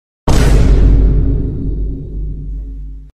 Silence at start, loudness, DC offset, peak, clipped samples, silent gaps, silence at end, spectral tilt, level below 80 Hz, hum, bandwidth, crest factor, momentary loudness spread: 0.25 s; -15 LUFS; under 0.1%; 0 dBFS; under 0.1%; none; 0.1 s; -7 dB/octave; -14 dBFS; none; 11 kHz; 12 dB; 16 LU